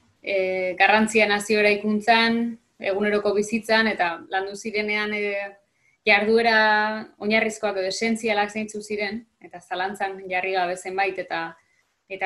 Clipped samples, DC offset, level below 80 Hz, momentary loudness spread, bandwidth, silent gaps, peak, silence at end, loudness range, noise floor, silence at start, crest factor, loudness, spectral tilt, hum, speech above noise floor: under 0.1%; under 0.1%; -64 dBFS; 12 LU; 12.5 kHz; none; -4 dBFS; 0 s; 6 LU; -50 dBFS; 0.25 s; 20 dB; -22 LUFS; -3.5 dB/octave; none; 27 dB